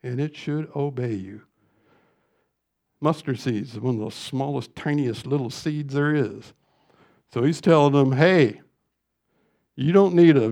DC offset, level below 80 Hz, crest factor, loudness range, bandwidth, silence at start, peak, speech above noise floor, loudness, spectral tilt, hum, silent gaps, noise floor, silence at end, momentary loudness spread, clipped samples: under 0.1%; -68 dBFS; 20 dB; 9 LU; 11.5 kHz; 0.05 s; -2 dBFS; 56 dB; -22 LUFS; -7.5 dB/octave; none; none; -77 dBFS; 0 s; 12 LU; under 0.1%